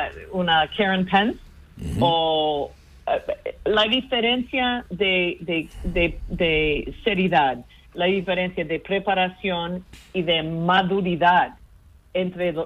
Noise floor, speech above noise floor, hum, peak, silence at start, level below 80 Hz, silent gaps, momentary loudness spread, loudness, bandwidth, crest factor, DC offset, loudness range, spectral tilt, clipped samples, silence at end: -51 dBFS; 28 dB; none; -4 dBFS; 0 s; -42 dBFS; none; 10 LU; -22 LUFS; 11.5 kHz; 18 dB; under 0.1%; 1 LU; -6.5 dB/octave; under 0.1%; 0 s